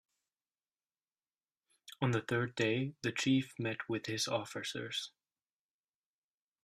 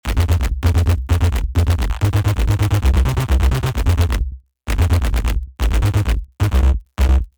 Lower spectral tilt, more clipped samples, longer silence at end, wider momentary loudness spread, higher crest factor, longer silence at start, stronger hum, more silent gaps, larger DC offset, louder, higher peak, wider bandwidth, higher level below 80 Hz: second, -4.5 dB/octave vs -6 dB/octave; neither; first, 1.55 s vs 0.1 s; first, 8 LU vs 5 LU; first, 20 dB vs 14 dB; first, 1.9 s vs 0.05 s; neither; neither; neither; second, -36 LUFS vs -18 LUFS; second, -20 dBFS vs -2 dBFS; second, 15 kHz vs over 20 kHz; second, -76 dBFS vs -18 dBFS